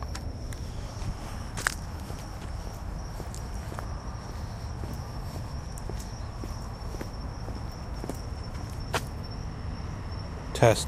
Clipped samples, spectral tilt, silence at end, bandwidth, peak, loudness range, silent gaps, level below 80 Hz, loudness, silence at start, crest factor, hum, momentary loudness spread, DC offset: under 0.1%; -5 dB/octave; 0 s; 15.5 kHz; -4 dBFS; 2 LU; none; -38 dBFS; -36 LUFS; 0 s; 30 dB; none; 7 LU; under 0.1%